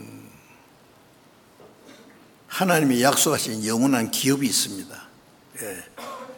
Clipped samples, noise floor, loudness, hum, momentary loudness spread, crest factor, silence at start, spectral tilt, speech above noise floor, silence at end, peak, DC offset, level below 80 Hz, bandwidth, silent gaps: under 0.1%; -54 dBFS; -21 LUFS; none; 20 LU; 22 dB; 0 s; -3.5 dB/octave; 32 dB; 0 s; -4 dBFS; under 0.1%; -68 dBFS; over 20 kHz; none